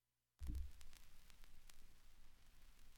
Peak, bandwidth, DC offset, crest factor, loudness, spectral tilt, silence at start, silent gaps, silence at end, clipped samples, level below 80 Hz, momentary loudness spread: -36 dBFS; 17 kHz; under 0.1%; 18 dB; -58 LUFS; -5 dB/octave; 0.4 s; none; 0 s; under 0.1%; -56 dBFS; 16 LU